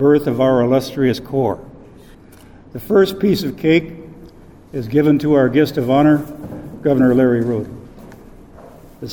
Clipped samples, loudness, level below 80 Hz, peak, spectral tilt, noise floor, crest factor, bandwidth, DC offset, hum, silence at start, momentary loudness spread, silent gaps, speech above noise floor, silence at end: under 0.1%; -16 LUFS; -44 dBFS; -2 dBFS; -7.5 dB/octave; -42 dBFS; 14 dB; over 20 kHz; 0.2%; none; 0 s; 18 LU; none; 27 dB; 0 s